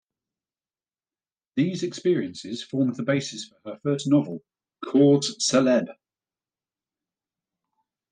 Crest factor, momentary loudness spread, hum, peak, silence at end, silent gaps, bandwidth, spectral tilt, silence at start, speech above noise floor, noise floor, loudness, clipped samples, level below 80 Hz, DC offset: 18 dB; 16 LU; none; -8 dBFS; 2.2 s; none; 9.8 kHz; -5 dB/octave; 1.55 s; over 67 dB; under -90 dBFS; -24 LUFS; under 0.1%; -74 dBFS; under 0.1%